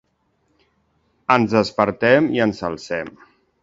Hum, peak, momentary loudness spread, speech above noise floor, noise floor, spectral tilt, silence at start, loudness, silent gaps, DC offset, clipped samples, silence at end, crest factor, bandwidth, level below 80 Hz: none; 0 dBFS; 12 LU; 48 dB; -66 dBFS; -6 dB/octave; 1.3 s; -19 LUFS; none; under 0.1%; under 0.1%; 0.55 s; 20 dB; 7.8 kHz; -54 dBFS